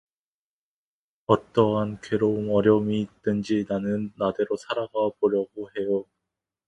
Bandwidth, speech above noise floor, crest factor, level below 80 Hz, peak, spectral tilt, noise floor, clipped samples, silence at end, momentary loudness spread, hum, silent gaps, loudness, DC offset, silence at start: 9 kHz; over 66 dB; 22 dB; -60 dBFS; -4 dBFS; -7.5 dB/octave; under -90 dBFS; under 0.1%; 0.65 s; 8 LU; none; none; -25 LUFS; under 0.1%; 1.3 s